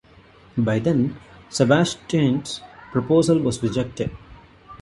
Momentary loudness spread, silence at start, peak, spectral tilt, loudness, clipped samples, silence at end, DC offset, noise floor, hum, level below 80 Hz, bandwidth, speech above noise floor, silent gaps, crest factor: 13 LU; 0.55 s; -2 dBFS; -6 dB/octave; -22 LUFS; under 0.1%; 0.05 s; under 0.1%; -50 dBFS; none; -48 dBFS; 11.5 kHz; 30 dB; none; 20 dB